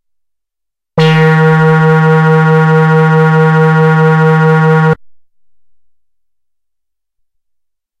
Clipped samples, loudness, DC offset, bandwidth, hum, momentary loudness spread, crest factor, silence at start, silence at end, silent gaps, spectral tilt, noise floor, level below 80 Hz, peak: under 0.1%; -8 LUFS; under 0.1%; 6.4 kHz; none; 3 LU; 10 dB; 0.95 s; 2.9 s; none; -8.5 dB/octave; -78 dBFS; -52 dBFS; 0 dBFS